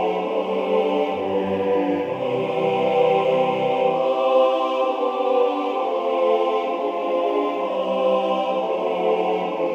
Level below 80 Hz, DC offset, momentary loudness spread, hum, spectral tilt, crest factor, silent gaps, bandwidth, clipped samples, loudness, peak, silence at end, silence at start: -68 dBFS; under 0.1%; 5 LU; none; -6.5 dB/octave; 14 dB; none; 7 kHz; under 0.1%; -21 LUFS; -6 dBFS; 0 s; 0 s